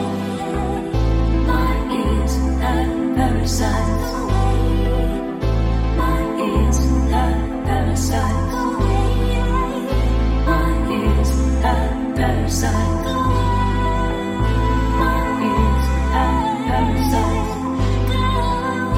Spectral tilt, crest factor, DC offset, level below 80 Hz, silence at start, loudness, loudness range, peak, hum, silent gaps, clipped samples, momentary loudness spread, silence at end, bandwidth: -6 dB/octave; 14 dB; under 0.1%; -20 dBFS; 0 s; -19 LUFS; 1 LU; -4 dBFS; none; none; under 0.1%; 3 LU; 0 s; 15.5 kHz